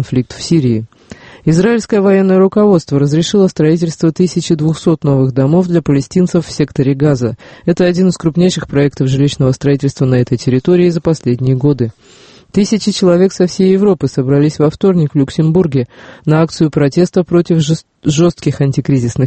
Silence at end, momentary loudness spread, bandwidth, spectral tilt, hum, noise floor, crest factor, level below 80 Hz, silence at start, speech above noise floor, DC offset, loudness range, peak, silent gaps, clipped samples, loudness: 0 s; 6 LU; 8.8 kHz; -7 dB/octave; none; -36 dBFS; 12 dB; -42 dBFS; 0 s; 24 dB; under 0.1%; 2 LU; 0 dBFS; none; under 0.1%; -12 LUFS